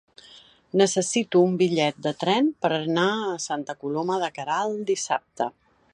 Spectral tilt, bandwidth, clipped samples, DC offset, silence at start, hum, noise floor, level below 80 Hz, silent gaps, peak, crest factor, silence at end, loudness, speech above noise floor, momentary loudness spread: -4.5 dB/octave; 11 kHz; under 0.1%; under 0.1%; 0.35 s; none; -52 dBFS; -72 dBFS; none; -6 dBFS; 18 dB; 0.45 s; -24 LUFS; 28 dB; 9 LU